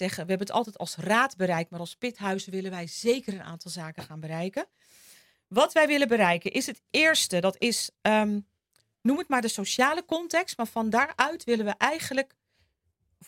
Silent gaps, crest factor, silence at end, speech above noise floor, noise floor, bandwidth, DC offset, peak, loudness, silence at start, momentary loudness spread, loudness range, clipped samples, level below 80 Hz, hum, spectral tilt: none; 24 dB; 1.05 s; 47 dB; -74 dBFS; 16.5 kHz; under 0.1%; -4 dBFS; -26 LUFS; 0 s; 14 LU; 8 LU; under 0.1%; -72 dBFS; none; -3.5 dB/octave